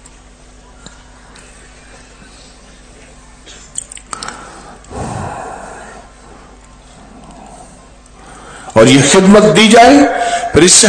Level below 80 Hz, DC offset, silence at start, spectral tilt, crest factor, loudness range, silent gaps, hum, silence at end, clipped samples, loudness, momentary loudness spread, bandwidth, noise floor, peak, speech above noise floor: -38 dBFS; under 0.1%; 3.75 s; -3.5 dB/octave; 14 dB; 23 LU; none; none; 0 s; 2%; -7 LUFS; 26 LU; 11 kHz; -39 dBFS; 0 dBFS; 33 dB